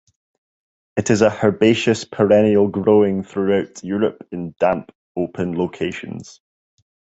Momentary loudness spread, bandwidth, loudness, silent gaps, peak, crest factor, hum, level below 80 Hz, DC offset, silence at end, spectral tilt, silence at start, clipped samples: 14 LU; 8.2 kHz; -18 LUFS; 4.95-5.15 s; 0 dBFS; 18 dB; none; -52 dBFS; under 0.1%; 0.9 s; -6 dB/octave; 0.95 s; under 0.1%